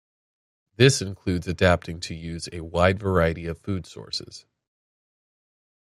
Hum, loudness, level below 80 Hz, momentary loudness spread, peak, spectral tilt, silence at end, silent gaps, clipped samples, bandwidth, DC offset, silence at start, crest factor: none; -24 LUFS; -50 dBFS; 14 LU; -2 dBFS; -5 dB/octave; 1.6 s; none; under 0.1%; 13 kHz; under 0.1%; 0.8 s; 24 dB